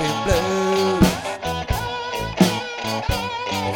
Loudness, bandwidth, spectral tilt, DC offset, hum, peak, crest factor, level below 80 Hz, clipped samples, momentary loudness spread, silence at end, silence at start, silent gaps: -21 LUFS; 18 kHz; -5 dB/octave; under 0.1%; none; -2 dBFS; 20 dB; -34 dBFS; under 0.1%; 8 LU; 0 s; 0 s; none